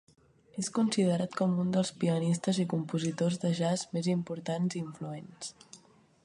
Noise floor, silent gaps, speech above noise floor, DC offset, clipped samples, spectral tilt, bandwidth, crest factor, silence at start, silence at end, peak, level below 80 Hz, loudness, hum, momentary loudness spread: -60 dBFS; none; 30 dB; under 0.1%; under 0.1%; -6 dB/octave; 11 kHz; 16 dB; 0.55 s; 0.5 s; -16 dBFS; -72 dBFS; -31 LUFS; none; 13 LU